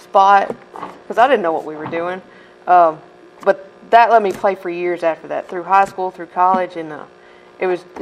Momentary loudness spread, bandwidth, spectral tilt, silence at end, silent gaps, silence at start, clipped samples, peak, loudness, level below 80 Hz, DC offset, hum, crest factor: 18 LU; 10.5 kHz; -5.5 dB/octave; 0 s; none; 0.15 s; under 0.1%; 0 dBFS; -16 LUFS; -64 dBFS; under 0.1%; none; 16 dB